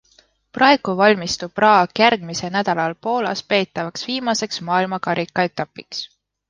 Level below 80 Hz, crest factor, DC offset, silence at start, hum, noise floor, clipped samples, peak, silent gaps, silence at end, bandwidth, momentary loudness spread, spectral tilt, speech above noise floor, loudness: -58 dBFS; 18 dB; under 0.1%; 0.55 s; none; -57 dBFS; under 0.1%; -2 dBFS; none; 0.45 s; 10 kHz; 13 LU; -4 dB/octave; 38 dB; -19 LUFS